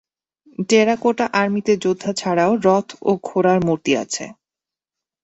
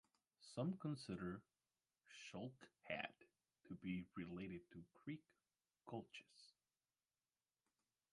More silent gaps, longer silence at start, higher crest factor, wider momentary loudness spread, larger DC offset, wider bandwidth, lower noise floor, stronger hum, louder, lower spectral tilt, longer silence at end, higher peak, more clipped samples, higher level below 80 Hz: neither; first, 0.6 s vs 0.4 s; second, 16 dB vs 24 dB; second, 11 LU vs 17 LU; neither; second, 8.2 kHz vs 11 kHz; about the same, -89 dBFS vs under -90 dBFS; neither; first, -18 LUFS vs -52 LUFS; about the same, -5 dB/octave vs -6 dB/octave; second, 0.9 s vs 1.65 s; first, -2 dBFS vs -30 dBFS; neither; first, -60 dBFS vs -80 dBFS